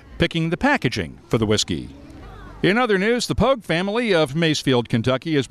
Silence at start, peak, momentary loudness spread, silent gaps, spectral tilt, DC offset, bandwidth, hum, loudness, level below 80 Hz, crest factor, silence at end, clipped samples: 0.1 s; -6 dBFS; 7 LU; none; -5 dB/octave; under 0.1%; 13.5 kHz; none; -20 LUFS; -42 dBFS; 14 dB; 0.05 s; under 0.1%